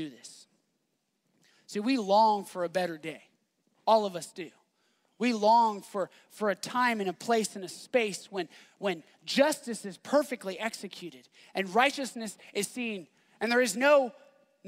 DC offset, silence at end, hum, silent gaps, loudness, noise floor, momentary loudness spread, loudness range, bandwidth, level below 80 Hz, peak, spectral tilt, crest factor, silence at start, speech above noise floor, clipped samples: under 0.1%; 0 s; none; none; -29 LUFS; -78 dBFS; 18 LU; 3 LU; 16 kHz; -84 dBFS; -8 dBFS; -3.5 dB/octave; 22 dB; 0 s; 49 dB; under 0.1%